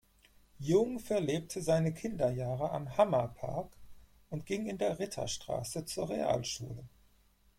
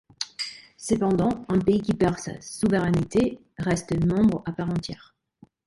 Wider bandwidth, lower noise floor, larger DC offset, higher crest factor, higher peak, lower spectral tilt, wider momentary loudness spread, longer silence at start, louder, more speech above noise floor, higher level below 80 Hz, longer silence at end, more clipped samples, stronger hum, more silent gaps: first, 16.5 kHz vs 11.5 kHz; first, -67 dBFS vs -57 dBFS; neither; about the same, 20 dB vs 16 dB; second, -14 dBFS vs -8 dBFS; about the same, -5.5 dB/octave vs -6 dB/octave; about the same, 12 LU vs 12 LU; first, 0.6 s vs 0.2 s; second, -34 LUFS vs -25 LUFS; about the same, 33 dB vs 33 dB; second, -60 dBFS vs -48 dBFS; about the same, 0.7 s vs 0.7 s; neither; neither; neither